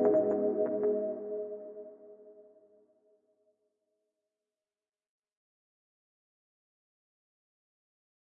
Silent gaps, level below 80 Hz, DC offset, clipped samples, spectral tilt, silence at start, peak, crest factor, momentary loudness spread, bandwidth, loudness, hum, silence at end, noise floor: none; under -90 dBFS; under 0.1%; under 0.1%; -10.5 dB/octave; 0 s; -16 dBFS; 20 dB; 23 LU; 2.4 kHz; -32 LUFS; none; 5.8 s; under -90 dBFS